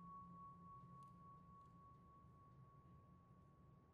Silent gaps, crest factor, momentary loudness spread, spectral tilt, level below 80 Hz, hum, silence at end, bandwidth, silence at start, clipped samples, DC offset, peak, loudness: none; 12 dB; 9 LU; -8.5 dB/octave; -78 dBFS; none; 0 s; 4.5 kHz; 0 s; under 0.1%; under 0.1%; -52 dBFS; -64 LUFS